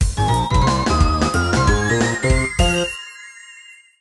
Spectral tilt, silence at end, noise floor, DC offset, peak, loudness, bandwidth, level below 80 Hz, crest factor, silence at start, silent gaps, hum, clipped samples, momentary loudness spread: -5 dB/octave; 0.3 s; -44 dBFS; under 0.1%; -2 dBFS; -18 LUFS; 12 kHz; -24 dBFS; 16 dB; 0 s; none; none; under 0.1%; 17 LU